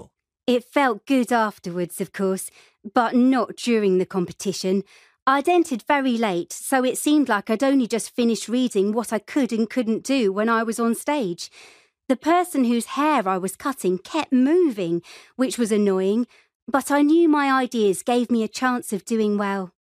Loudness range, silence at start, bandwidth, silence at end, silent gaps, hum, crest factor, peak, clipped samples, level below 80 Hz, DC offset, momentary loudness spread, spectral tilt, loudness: 2 LU; 0 s; 15.5 kHz; 0.15 s; 5.22-5.26 s, 16.55-16.67 s; none; 16 dB; -4 dBFS; under 0.1%; -70 dBFS; under 0.1%; 8 LU; -4.5 dB/octave; -22 LUFS